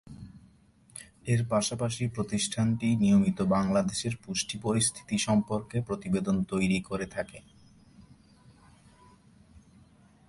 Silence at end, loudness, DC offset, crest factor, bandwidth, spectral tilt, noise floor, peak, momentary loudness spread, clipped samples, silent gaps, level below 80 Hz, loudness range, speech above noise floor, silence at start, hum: 2.3 s; -29 LUFS; under 0.1%; 16 dB; 11.5 kHz; -5 dB/octave; -60 dBFS; -14 dBFS; 16 LU; under 0.1%; none; -56 dBFS; 9 LU; 32 dB; 0.1 s; none